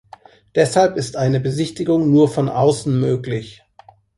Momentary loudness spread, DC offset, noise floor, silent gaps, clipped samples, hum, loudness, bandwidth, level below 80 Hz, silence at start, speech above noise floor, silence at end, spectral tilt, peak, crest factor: 8 LU; under 0.1%; -49 dBFS; none; under 0.1%; none; -18 LUFS; 11.5 kHz; -52 dBFS; 0.55 s; 32 dB; 0.65 s; -6.5 dB/octave; -2 dBFS; 16 dB